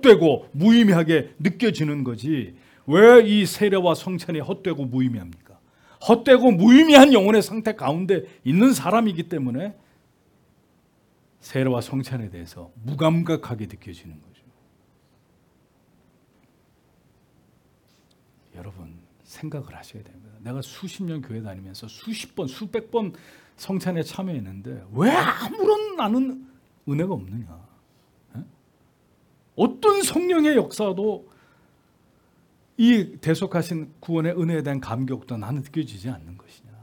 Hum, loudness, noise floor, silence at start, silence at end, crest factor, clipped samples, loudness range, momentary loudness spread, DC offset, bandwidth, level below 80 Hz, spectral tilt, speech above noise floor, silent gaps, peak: none; -20 LUFS; -61 dBFS; 0 s; 0.45 s; 22 dB; under 0.1%; 19 LU; 23 LU; under 0.1%; 18 kHz; -62 dBFS; -6 dB/octave; 41 dB; none; 0 dBFS